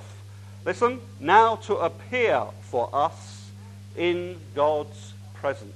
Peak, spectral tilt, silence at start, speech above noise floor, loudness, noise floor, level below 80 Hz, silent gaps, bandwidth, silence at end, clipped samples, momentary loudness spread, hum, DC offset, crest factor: -4 dBFS; -5.5 dB/octave; 0 s; 18 dB; -25 LUFS; -42 dBFS; -68 dBFS; none; 12.5 kHz; 0 s; under 0.1%; 23 LU; 50 Hz at -40 dBFS; under 0.1%; 22 dB